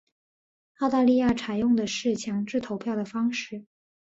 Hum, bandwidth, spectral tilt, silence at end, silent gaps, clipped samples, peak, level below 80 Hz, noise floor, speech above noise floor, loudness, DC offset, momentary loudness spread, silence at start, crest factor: none; 8 kHz; -5 dB/octave; 0.4 s; none; under 0.1%; -12 dBFS; -60 dBFS; under -90 dBFS; over 65 dB; -26 LUFS; under 0.1%; 9 LU; 0.8 s; 16 dB